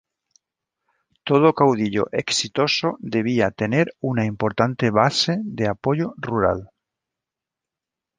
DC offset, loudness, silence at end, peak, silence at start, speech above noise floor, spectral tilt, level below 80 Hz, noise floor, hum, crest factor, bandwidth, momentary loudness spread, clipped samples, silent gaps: under 0.1%; -21 LUFS; 1.55 s; -2 dBFS; 1.25 s; 66 dB; -5 dB/octave; -52 dBFS; -87 dBFS; none; 20 dB; 10 kHz; 7 LU; under 0.1%; none